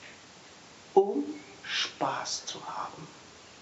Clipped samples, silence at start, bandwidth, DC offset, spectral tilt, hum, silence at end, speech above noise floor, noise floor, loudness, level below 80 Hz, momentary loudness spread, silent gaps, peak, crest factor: under 0.1%; 0 s; 8 kHz; under 0.1%; -1.5 dB/octave; none; 0 s; 17 dB; -52 dBFS; -31 LUFS; -74 dBFS; 24 LU; none; -8 dBFS; 24 dB